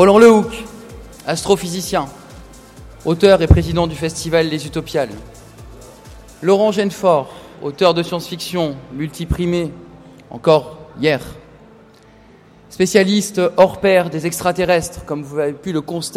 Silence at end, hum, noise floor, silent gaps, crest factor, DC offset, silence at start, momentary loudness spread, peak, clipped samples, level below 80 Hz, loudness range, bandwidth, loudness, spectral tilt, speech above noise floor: 0 s; none; -45 dBFS; none; 16 dB; under 0.1%; 0 s; 16 LU; 0 dBFS; under 0.1%; -32 dBFS; 4 LU; 16 kHz; -16 LUFS; -5.5 dB/octave; 30 dB